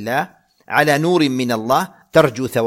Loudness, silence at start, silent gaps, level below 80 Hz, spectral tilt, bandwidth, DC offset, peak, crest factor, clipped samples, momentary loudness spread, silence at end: -17 LUFS; 0 s; none; -54 dBFS; -5 dB/octave; 16.5 kHz; under 0.1%; 0 dBFS; 18 dB; under 0.1%; 7 LU; 0 s